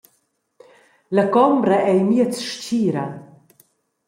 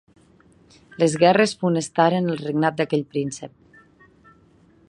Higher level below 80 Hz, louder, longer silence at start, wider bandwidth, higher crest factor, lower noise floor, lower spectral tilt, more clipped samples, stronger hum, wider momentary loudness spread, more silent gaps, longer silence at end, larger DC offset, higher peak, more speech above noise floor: about the same, -68 dBFS vs -64 dBFS; first, -18 LUFS vs -21 LUFS; about the same, 1.1 s vs 1 s; first, 16 kHz vs 11 kHz; second, 16 dB vs 22 dB; first, -67 dBFS vs -55 dBFS; about the same, -6 dB/octave vs -5.5 dB/octave; neither; neither; about the same, 11 LU vs 12 LU; neither; second, 0.85 s vs 1.4 s; neither; about the same, -4 dBFS vs -2 dBFS; first, 50 dB vs 34 dB